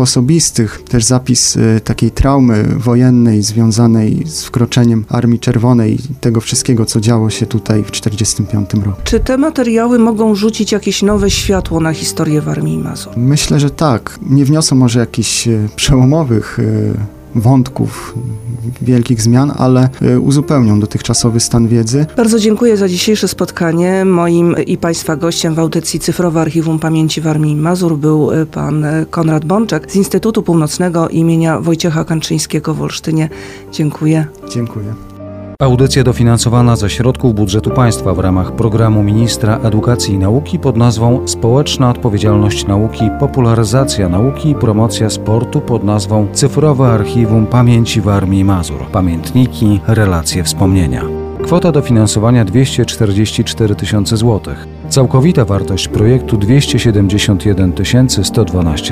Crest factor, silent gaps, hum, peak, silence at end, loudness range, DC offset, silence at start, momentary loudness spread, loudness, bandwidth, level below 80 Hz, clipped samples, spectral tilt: 10 dB; none; none; 0 dBFS; 0 s; 3 LU; under 0.1%; 0 s; 6 LU; -12 LUFS; 15.5 kHz; -30 dBFS; under 0.1%; -5.5 dB/octave